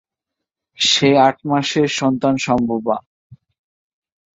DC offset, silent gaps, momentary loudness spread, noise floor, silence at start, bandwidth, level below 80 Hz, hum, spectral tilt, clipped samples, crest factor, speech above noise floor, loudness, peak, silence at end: under 0.1%; 3.06-3.30 s; 8 LU; -82 dBFS; 0.8 s; 8 kHz; -54 dBFS; none; -4 dB/octave; under 0.1%; 18 dB; 66 dB; -16 LUFS; -2 dBFS; 1 s